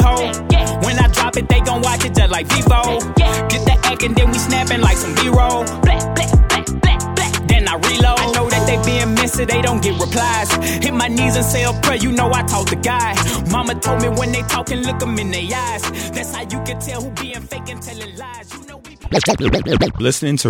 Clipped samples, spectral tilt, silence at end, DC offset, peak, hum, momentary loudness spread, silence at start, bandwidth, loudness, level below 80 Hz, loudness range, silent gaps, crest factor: under 0.1%; -4.5 dB/octave; 0 s; under 0.1%; 0 dBFS; none; 10 LU; 0 s; 18 kHz; -16 LUFS; -22 dBFS; 7 LU; none; 16 dB